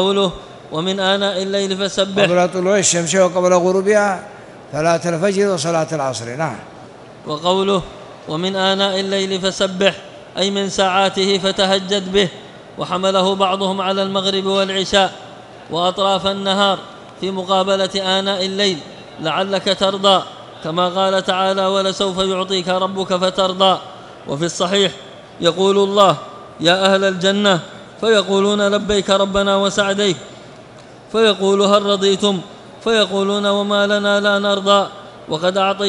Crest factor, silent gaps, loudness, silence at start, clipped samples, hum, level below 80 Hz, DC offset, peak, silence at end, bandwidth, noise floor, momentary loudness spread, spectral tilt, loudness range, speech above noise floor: 18 dB; none; -16 LUFS; 0 s; under 0.1%; none; -50 dBFS; under 0.1%; 0 dBFS; 0 s; 11.5 kHz; -39 dBFS; 12 LU; -4 dB/octave; 3 LU; 23 dB